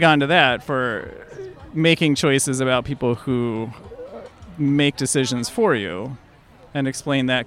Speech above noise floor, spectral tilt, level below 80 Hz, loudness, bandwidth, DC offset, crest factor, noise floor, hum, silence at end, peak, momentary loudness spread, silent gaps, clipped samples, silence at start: 28 dB; -4.5 dB/octave; -52 dBFS; -20 LUFS; 15.5 kHz; under 0.1%; 20 dB; -48 dBFS; none; 0 s; 0 dBFS; 21 LU; none; under 0.1%; 0 s